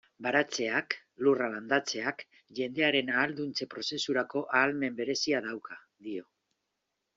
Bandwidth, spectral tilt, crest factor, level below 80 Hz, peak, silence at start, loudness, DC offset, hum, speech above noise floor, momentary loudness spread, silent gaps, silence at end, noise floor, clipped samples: 7.8 kHz; -1.5 dB/octave; 22 dB; -76 dBFS; -10 dBFS; 0.2 s; -30 LUFS; under 0.1%; none; 52 dB; 14 LU; none; 0.95 s; -83 dBFS; under 0.1%